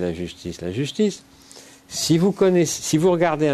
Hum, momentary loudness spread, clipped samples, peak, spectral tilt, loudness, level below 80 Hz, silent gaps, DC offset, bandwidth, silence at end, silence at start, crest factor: none; 13 LU; under 0.1%; -6 dBFS; -5 dB/octave; -21 LUFS; -54 dBFS; none; under 0.1%; 13.5 kHz; 0 s; 0 s; 16 dB